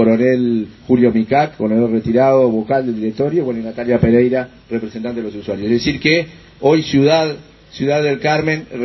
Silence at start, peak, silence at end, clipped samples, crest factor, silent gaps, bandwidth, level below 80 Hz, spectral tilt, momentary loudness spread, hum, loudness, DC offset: 0 s; 0 dBFS; 0 s; under 0.1%; 14 dB; none; 6.2 kHz; -42 dBFS; -7 dB/octave; 11 LU; none; -16 LUFS; under 0.1%